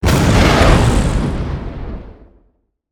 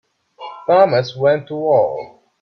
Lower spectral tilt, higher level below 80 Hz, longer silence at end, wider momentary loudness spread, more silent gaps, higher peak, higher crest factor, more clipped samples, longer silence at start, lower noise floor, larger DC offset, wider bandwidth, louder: second, -5.5 dB/octave vs -7 dB/octave; first, -20 dBFS vs -62 dBFS; first, 0.8 s vs 0.35 s; about the same, 19 LU vs 18 LU; neither; about the same, 0 dBFS vs 0 dBFS; about the same, 14 dB vs 16 dB; neither; second, 0 s vs 0.4 s; first, -59 dBFS vs -36 dBFS; neither; first, over 20 kHz vs 6.4 kHz; first, -13 LUFS vs -16 LUFS